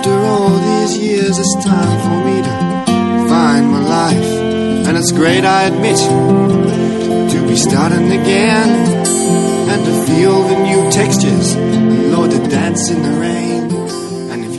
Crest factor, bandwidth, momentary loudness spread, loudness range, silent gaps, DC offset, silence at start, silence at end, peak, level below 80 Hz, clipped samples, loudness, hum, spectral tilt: 12 dB; 12 kHz; 5 LU; 1 LU; none; under 0.1%; 0 s; 0 s; 0 dBFS; -46 dBFS; under 0.1%; -12 LUFS; none; -5 dB/octave